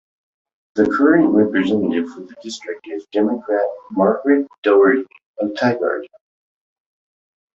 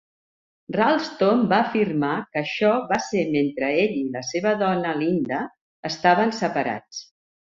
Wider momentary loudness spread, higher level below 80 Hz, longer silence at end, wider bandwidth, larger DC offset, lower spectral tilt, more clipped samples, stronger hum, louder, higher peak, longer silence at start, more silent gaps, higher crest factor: first, 16 LU vs 10 LU; about the same, -60 dBFS vs -64 dBFS; first, 1.5 s vs 0.55 s; about the same, 7.8 kHz vs 7.6 kHz; neither; about the same, -6.5 dB/octave vs -5.5 dB/octave; neither; neither; first, -17 LUFS vs -22 LUFS; about the same, -2 dBFS vs -2 dBFS; about the same, 0.75 s vs 0.7 s; second, 4.58-4.62 s, 5.26-5.34 s vs 5.61-5.83 s; about the same, 16 dB vs 20 dB